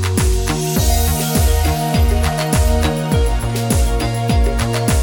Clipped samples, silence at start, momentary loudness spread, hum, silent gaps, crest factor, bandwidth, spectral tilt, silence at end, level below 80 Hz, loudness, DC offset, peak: under 0.1%; 0 s; 3 LU; none; none; 12 dB; 19 kHz; -5 dB/octave; 0 s; -18 dBFS; -17 LUFS; under 0.1%; -2 dBFS